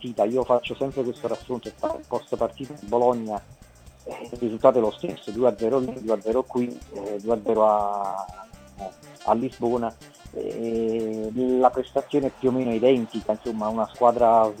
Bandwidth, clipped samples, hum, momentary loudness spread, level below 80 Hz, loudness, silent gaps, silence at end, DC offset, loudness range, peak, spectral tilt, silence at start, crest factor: 14.5 kHz; under 0.1%; none; 14 LU; -54 dBFS; -24 LUFS; none; 0 s; under 0.1%; 5 LU; -2 dBFS; -7 dB/octave; 0 s; 22 dB